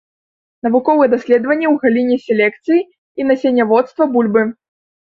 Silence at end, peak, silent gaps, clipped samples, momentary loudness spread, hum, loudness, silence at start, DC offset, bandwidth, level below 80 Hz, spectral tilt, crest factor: 0.55 s; -2 dBFS; 2.98-3.15 s; under 0.1%; 5 LU; none; -15 LUFS; 0.65 s; under 0.1%; 7 kHz; -62 dBFS; -7.5 dB/octave; 14 dB